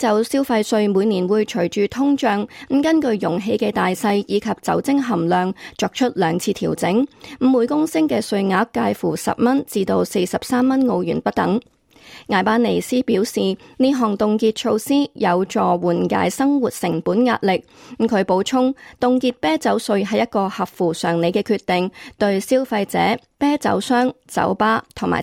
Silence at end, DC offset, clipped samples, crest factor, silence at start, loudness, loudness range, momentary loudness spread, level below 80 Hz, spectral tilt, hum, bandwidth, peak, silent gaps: 0 s; under 0.1%; under 0.1%; 14 dB; 0 s; -19 LUFS; 1 LU; 4 LU; -56 dBFS; -5.5 dB/octave; none; 16.5 kHz; -4 dBFS; none